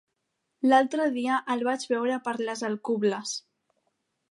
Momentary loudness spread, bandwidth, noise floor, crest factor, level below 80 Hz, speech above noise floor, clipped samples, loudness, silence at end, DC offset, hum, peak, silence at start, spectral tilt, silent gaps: 9 LU; 11.5 kHz; -80 dBFS; 20 dB; -84 dBFS; 54 dB; under 0.1%; -27 LUFS; 0.9 s; under 0.1%; none; -8 dBFS; 0.65 s; -4 dB/octave; none